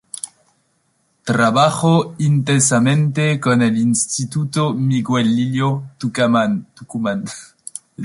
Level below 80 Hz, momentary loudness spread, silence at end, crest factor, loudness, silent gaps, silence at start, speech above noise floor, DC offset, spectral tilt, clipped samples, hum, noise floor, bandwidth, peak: -58 dBFS; 16 LU; 0 s; 16 dB; -17 LUFS; none; 0.25 s; 47 dB; under 0.1%; -5 dB/octave; under 0.1%; none; -64 dBFS; 11.5 kHz; -2 dBFS